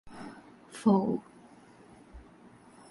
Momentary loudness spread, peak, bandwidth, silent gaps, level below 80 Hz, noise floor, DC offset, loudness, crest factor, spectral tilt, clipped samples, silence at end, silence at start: 27 LU; -12 dBFS; 11.5 kHz; none; -62 dBFS; -56 dBFS; under 0.1%; -29 LUFS; 22 dB; -8 dB/octave; under 0.1%; 0.7 s; 0.05 s